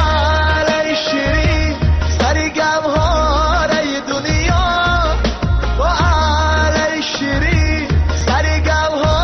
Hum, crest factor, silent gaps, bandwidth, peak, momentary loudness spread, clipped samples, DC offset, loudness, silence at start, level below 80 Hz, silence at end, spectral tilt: none; 10 dB; none; 6.6 kHz; -4 dBFS; 3 LU; under 0.1%; under 0.1%; -15 LUFS; 0 s; -20 dBFS; 0 s; -5 dB/octave